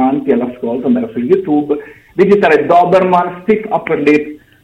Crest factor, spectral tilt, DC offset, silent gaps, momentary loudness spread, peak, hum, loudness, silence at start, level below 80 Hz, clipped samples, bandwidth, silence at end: 12 dB; -8 dB/octave; under 0.1%; none; 10 LU; 0 dBFS; none; -12 LUFS; 0 s; -50 dBFS; under 0.1%; 9 kHz; 0.25 s